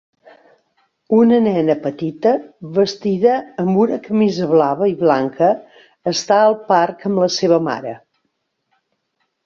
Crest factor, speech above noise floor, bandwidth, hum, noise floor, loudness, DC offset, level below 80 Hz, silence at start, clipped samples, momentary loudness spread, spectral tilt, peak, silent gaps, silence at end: 16 dB; 55 dB; 7.4 kHz; none; -71 dBFS; -16 LUFS; under 0.1%; -62 dBFS; 1.1 s; under 0.1%; 9 LU; -6 dB/octave; 0 dBFS; none; 1.5 s